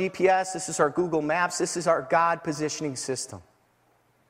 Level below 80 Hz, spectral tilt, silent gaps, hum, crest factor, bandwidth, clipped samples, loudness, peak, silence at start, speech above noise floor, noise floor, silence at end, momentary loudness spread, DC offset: -66 dBFS; -4 dB/octave; none; none; 18 dB; 15.5 kHz; under 0.1%; -26 LUFS; -8 dBFS; 0 s; 40 dB; -65 dBFS; 0.9 s; 8 LU; under 0.1%